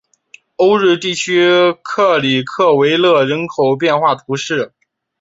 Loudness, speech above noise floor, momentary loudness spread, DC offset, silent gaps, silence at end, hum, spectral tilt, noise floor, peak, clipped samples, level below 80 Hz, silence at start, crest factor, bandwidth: -13 LUFS; 33 dB; 7 LU; under 0.1%; none; 0.55 s; none; -4.5 dB/octave; -46 dBFS; -2 dBFS; under 0.1%; -60 dBFS; 0.6 s; 14 dB; 8 kHz